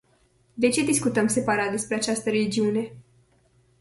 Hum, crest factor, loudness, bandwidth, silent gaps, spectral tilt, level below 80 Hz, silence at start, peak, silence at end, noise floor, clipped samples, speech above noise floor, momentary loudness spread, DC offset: none; 18 dB; -24 LUFS; 12 kHz; none; -4 dB/octave; -60 dBFS; 0.55 s; -8 dBFS; 0.8 s; -63 dBFS; under 0.1%; 39 dB; 6 LU; under 0.1%